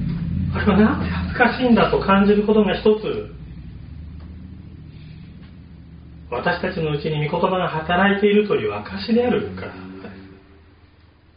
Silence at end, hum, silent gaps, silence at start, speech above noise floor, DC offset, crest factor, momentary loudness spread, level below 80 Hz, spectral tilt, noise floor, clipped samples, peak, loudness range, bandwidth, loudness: 1.05 s; none; none; 0 s; 33 dB; under 0.1%; 18 dB; 23 LU; -40 dBFS; -5 dB/octave; -51 dBFS; under 0.1%; -2 dBFS; 12 LU; 5.2 kHz; -19 LUFS